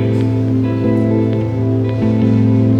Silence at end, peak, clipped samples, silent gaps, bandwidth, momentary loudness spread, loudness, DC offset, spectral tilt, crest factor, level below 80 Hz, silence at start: 0 s; -2 dBFS; under 0.1%; none; 5.4 kHz; 4 LU; -15 LUFS; under 0.1%; -10 dB/octave; 12 dB; -40 dBFS; 0 s